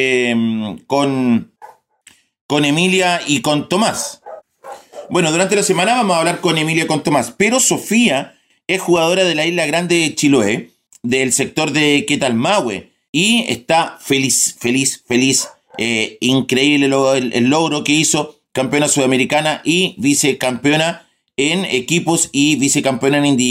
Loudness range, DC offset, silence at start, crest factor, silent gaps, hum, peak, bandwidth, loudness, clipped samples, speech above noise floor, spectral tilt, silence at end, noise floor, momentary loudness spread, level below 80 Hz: 2 LU; under 0.1%; 0 s; 14 dB; 2.41-2.49 s, 13.09-13.13 s; none; -2 dBFS; 16 kHz; -15 LUFS; under 0.1%; 35 dB; -3.5 dB/octave; 0 s; -50 dBFS; 7 LU; -58 dBFS